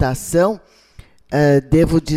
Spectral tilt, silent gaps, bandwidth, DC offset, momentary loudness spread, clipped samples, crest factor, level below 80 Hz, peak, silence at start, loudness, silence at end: -6.5 dB/octave; none; 16 kHz; under 0.1%; 8 LU; under 0.1%; 14 dB; -34 dBFS; -4 dBFS; 0 s; -16 LUFS; 0 s